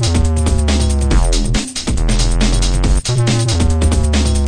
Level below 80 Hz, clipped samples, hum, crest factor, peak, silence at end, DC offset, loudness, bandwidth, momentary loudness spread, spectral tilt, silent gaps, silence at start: -14 dBFS; under 0.1%; none; 10 dB; -2 dBFS; 0 s; 2%; -15 LUFS; 10.5 kHz; 3 LU; -5 dB/octave; none; 0 s